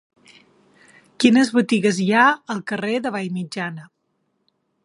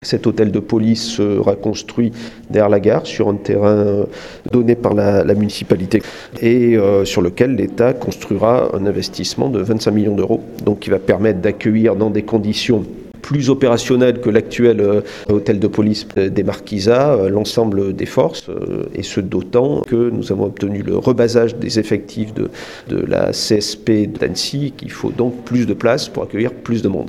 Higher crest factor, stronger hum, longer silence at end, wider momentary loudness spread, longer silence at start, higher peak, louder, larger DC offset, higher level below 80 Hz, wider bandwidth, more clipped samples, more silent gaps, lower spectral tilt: about the same, 20 dB vs 16 dB; neither; first, 1 s vs 0 s; first, 12 LU vs 8 LU; first, 1.2 s vs 0 s; about the same, -2 dBFS vs 0 dBFS; second, -19 LUFS vs -16 LUFS; neither; second, -72 dBFS vs -46 dBFS; second, 11.5 kHz vs 14 kHz; neither; neither; about the same, -5 dB/octave vs -6 dB/octave